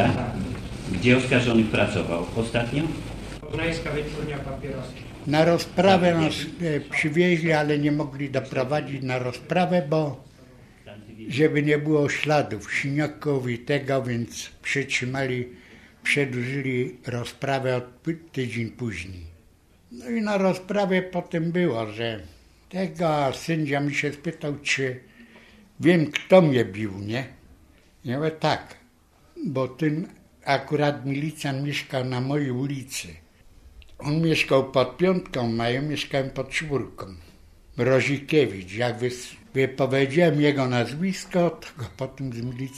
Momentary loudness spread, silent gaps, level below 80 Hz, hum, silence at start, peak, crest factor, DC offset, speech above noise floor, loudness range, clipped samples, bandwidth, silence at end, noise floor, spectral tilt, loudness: 13 LU; none; -50 dBFS; none; 0 s; -4 dBFS; 22 dB; under 0.1%; 33 dB; 5 LU; under 0.1%; 14 kHz; 0 s; -57 dBFS; -6 dB/octave; -25 LUFS